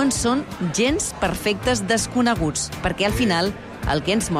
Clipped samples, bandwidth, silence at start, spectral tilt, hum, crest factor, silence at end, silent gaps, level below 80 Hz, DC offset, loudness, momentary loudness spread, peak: under 0.1%; 16 kHz; 0 s; -4 dB/octave; none; 12 dB; 0 s; none; -36 dBFS; under 0.1%; -21 LUFS; 5 LU; -10 dBFS